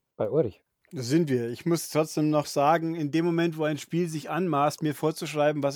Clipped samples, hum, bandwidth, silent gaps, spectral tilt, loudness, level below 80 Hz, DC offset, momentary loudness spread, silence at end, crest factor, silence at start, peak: under 0.1%; none; 19 kHz; none; -6 dB/octave; -27 LUFS; -72 dBFS; under 0.1%; 6 LU; 0 s; 16 dB; 0.2 s; -10 dBFS